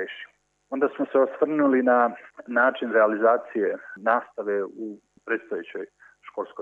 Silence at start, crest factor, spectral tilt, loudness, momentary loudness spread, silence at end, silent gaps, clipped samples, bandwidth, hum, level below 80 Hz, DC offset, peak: 0 s; 18 dB; -7 dB/octave; -24 LUFS; 18 LU; 0 s; none; under 0.1%; 7 kHz; 50 Hz at -75 dBFS; -80 dBFS; under 0.1%; -6 dBFS